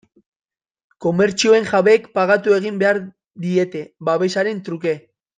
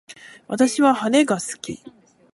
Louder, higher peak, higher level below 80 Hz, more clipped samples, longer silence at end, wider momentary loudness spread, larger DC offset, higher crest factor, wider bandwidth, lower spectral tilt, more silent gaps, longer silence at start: about the same, -18 LUFS vs -19 LUFS; about the same, -2 dBFS vs -4 dBFS; about the same, -64 dBFS vs -66 dBFS; neither; about the same, 0.4 s vs 0.45 s; second, 11 LU vs 16 LU; neither; about the same, 16 dB vs 18 dB; second, 9.4 kHz vs 11.5 kHz; about the same, -5 dB/octave vs -4 dB/octave; neither; first, 1 s vs 0.1 s